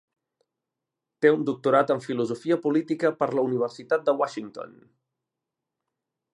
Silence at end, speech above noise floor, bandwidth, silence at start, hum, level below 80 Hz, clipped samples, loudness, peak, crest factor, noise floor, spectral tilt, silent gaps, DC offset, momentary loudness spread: 1.7 s; 62 dB; 11 kHz; 1.2 s; none; -78 dBFS; under 0.1%; -25 LUFS; -6 dBFS; 22 dB; -86 dBFS; -6.5 dB/octave; none; under 0.1%; 10 LU